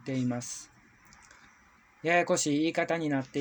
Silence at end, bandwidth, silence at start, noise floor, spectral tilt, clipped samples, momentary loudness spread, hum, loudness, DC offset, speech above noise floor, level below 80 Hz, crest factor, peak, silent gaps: 0 s; over 20 kHz; 0.05 s; -61 dBFS; -4.5 dB/octave; under 0.1%; 11 LU; none; -29 LUFS; under 0.1%; 32 dB; -70 dBFS; 18 dB; -12 dBFS; none